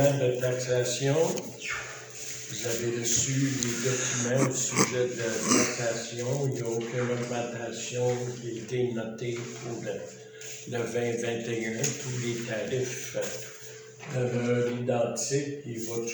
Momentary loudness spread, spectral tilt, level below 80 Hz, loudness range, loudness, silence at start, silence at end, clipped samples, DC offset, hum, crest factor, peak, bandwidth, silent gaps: 11 LU; -4 dB/octave; -66 dBFS; 6 LU; -29 LUFS; 0 s; 0 s; under 0.1%; under 0.1%; none; 24 dB; -6 dBFS; over 20 kHz; none